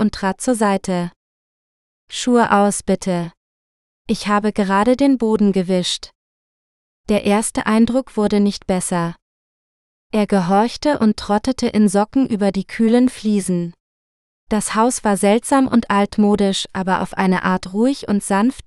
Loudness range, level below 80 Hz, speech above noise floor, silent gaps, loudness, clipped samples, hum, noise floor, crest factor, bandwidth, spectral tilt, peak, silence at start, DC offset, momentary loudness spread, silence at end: 2 LU; -46 dBFS; over 73 dB; 1.16-2.08 s, 3.37-4.05 s, 6.15-7.04 s, 9.22-10.10 s, 13.80-14.47 s; -17 LUFS; under 0.1%; none; under -90 dBFS; 18 dB; 12.5 kHz; -5 dB/octave; 0 dBFS; 0 s; under 0.1%; 8 LU; 0.05 s